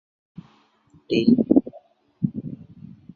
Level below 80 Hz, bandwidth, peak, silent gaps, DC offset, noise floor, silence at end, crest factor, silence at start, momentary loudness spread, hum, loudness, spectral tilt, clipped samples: -56 dBFS; 6.8 kHz; -2 dBFS; none; under 0.1%; -58 dBFS; 0.6 s; 22 dB; 1.1 s; 25 LU; none; -21 LUFS; -8.5 dB/octave; under 0.1%